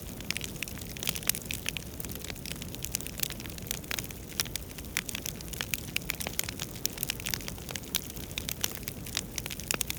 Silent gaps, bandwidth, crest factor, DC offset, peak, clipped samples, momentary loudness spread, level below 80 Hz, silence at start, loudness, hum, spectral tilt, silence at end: none; over 20 kHz; 30 dB; under 0.1%; -6 dBFS; under 0.1%; 6 LU; -48 dBFS; 0 s; -34 LUFS; none; -2 dB/octave; 0 s